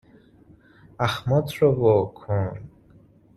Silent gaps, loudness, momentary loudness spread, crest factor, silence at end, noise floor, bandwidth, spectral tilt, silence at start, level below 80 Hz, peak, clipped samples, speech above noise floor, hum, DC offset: none; -23 LUFS; 9 LU; 20 dB; 0.7 s; -54 dBFS; 13 kHz; -7.5 dB/octave; 1 s; -54 dBFS; -6 dBFS; under 0.1%; 32 dB; none; under 0.1%